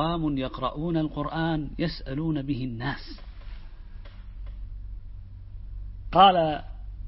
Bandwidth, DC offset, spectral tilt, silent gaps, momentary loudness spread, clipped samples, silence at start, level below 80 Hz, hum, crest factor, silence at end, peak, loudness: 5.8 kHz; under 0.1%; -10.5 dB/octave; none; 25 LU; under 0.1%; 0 s; -40 dBFS; none; 24 dB; 0 s; -4 dBFS; -26 LUFS